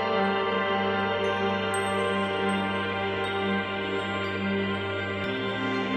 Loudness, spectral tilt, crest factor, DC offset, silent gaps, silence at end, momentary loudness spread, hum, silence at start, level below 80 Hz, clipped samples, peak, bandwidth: -27 LUFS; -5 dB/octave; 14 dB; under 0.1%; none; 0 s; 3 LU; none; 0 s; -62 dBFS; under 0.1%; -12 dBFS; 13.5 kHz